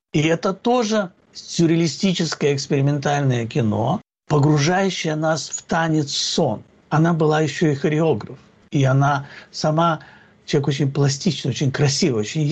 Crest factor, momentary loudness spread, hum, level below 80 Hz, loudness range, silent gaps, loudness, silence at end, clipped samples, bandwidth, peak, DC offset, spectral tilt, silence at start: 12 dB; 7 LU; none; -56 dBFS; 1 LU; none; -20 LUFS; 0 s; under 0.1%; 8.6 kHz; -8 dBFS; under 0.1%; -5.5 dB/octave; 0.15 s